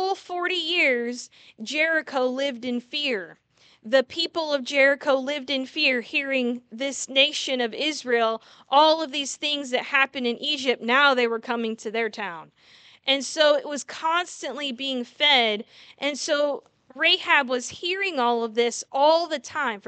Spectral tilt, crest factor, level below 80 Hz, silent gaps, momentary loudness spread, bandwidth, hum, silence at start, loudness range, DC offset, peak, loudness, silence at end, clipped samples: -1.5 dB/octave; 20 dB; -78 dBFS; none; 11 LU; 9.2 kHz; none; 0 s; 3 LU; under 0.1%; -4 dBFS; -23 LUFS; 0.1 s; under 0.1%